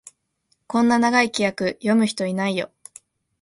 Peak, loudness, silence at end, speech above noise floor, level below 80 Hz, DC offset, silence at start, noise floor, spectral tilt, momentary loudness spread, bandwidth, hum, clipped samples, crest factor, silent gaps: -2 dBFS; -21 LUFS; 0.75 s; 49 dB; -64 dBFS; under 0.1%; 0.7 s; -69 dBFS; -4.5 dB/octave; 9 LU; 11.5 kHz; none; under 0.1%; 20 dB; none